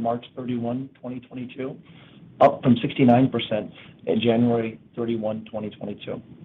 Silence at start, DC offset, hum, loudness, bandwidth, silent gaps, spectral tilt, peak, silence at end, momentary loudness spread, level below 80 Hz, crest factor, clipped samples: 0 s; under 0.1%; none; -23 LUFS; 4.2 kHz; none; -9.5 dB/octave; -6 dBFS; 0 s; 17 LU; -62 dBFS; 18 dB; under 0.1%